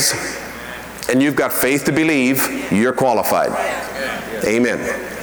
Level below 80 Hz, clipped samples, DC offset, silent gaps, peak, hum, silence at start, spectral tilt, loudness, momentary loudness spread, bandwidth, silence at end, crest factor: -48 dBFS; under 0.1%; under 0.1%; none; -6 dBFS; none; 0 s; -4 dB/octave; -17 LUFS; 10 LU; over 20 kHz; 0 s; 12 dB